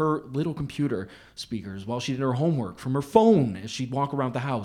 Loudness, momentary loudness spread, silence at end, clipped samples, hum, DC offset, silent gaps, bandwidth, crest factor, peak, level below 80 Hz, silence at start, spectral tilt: -26 LUFS; 14 LU; 0 s; under 0.1%; none; under 0.1%; none; 14.5 kHz; 22 dB; -4 dBFS; -56 dBFS; 0 s; -7 dB/octave